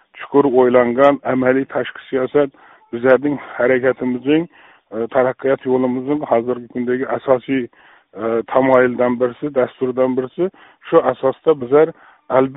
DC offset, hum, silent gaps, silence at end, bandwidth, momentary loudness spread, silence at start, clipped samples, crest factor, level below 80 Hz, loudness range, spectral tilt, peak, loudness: under 0.1%; none; none; 0 s; 4 kHz; 10 LU; 0.15 s; under 0.1%; 16 dB; -58 dBFS; 3 LU; -5.5 dB/octave; 0 dBFS; -17 LUFS